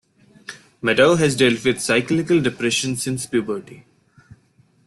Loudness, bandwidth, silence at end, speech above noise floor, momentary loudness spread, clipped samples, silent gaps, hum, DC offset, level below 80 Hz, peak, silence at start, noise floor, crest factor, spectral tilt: -19 LUFS; 12.5 kHz; 1.05 s; 39 dB; 20 LU; under 0.1%; none; none; under 0.1%; -56 dBFS; -2 dBFS; 0.5 s; -58 dBFS; 18 dB; -4.5 dB/octave